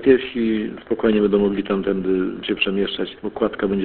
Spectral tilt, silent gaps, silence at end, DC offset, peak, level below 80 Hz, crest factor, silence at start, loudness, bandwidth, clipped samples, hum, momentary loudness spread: -11 dB/octave; none; 0 s; under 0.1%; -2 dBFS; -48 dBFS; 18 dB; 0 s; -21 LUFS; 4.4 kHz; under 0.1%; none; 8 LU